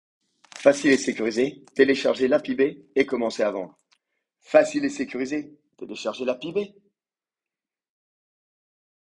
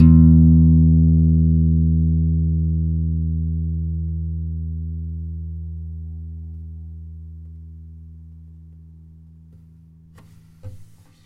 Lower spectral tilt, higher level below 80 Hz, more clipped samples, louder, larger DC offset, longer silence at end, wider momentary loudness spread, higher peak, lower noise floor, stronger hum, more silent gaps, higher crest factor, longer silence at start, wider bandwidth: second, -4 dB/octave vs -13.5 dB/octave; second, -68 dBFS vs -28 dBFS; neither; second, -23 LUFS vs -18 LUFS; neither; first, 2.5 s vs 0.4 s; second, 12 LU vs 25 LU; about the same, -2 dBFS vs 0 dBFS; first, under -90 dBFS vs -47 dBFS; neither; neither; about the same, 22 dB vs 18 dB; first, 0.55 s vs 0 s; first, 11 kHz vs 1.4 kHz